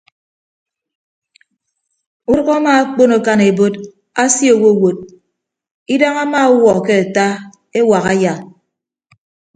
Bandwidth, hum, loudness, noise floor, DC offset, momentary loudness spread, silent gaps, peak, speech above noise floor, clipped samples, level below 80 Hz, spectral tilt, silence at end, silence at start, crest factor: 9.4 kHz; none; -13 LUFS; -75 dBFS; under 0.1%; 12 LU; 5.71-5.86 s; 0 dBFS; 63 dB; under 0.1%; -52 dBFS; -4.5 dB/octave; 1.1 s; 2.3 s; 14 dB